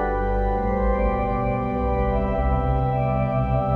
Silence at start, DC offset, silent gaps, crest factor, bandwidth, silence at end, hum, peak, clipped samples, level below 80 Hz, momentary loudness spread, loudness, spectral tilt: 0 s; under 0.1%; none; 12 dB; 4.2 kHz; 0 s; none; -10 dBFS; under 0.1%; -26 dBFS; 2 LU; -23 LUFS; -10.5 dB/octave